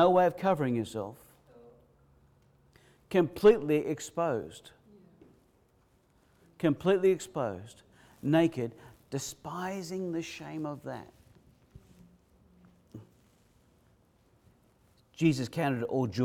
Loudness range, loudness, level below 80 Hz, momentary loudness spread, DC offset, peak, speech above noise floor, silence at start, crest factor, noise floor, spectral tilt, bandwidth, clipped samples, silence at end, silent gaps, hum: 11 LU; -30 LUFS; -66 dBFS; 20 LU; under 0.1%; -12 dBFS; 38 dB; 0 s; 22 dB; -67 dBFS; -6.5 dB/octave; 16 kHz; under 0.1%; 0 s; none; none